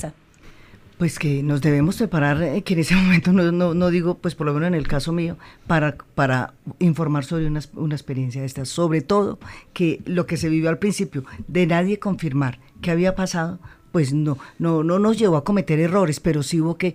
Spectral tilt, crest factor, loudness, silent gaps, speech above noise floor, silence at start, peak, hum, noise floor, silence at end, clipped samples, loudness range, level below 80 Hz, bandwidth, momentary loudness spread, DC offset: -6.5 dB/octave; 16 dB; -21 LUFS; none; 26 dB; 0 s; -4 dBFS; none; -47 dBFS; 0 s; under 0.1%; 4 LU; -42 dBFS; 15.5 kHz; 9 LU; under 0.1%